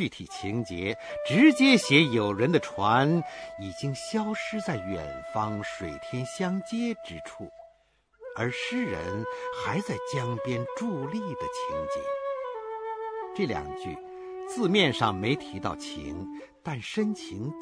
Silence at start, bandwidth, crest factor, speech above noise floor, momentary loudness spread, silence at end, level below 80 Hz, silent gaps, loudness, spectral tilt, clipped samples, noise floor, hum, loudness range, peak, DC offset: 0 s; 11 kHz; 22 dB; 37 dB; 16 LU; 0 s; -58 dBFS; none; -28 LUFS; -5.5 dB/octave; under 0.1%; -65 dBFS; none; 10 LU; -6 dBFS; under 0.1%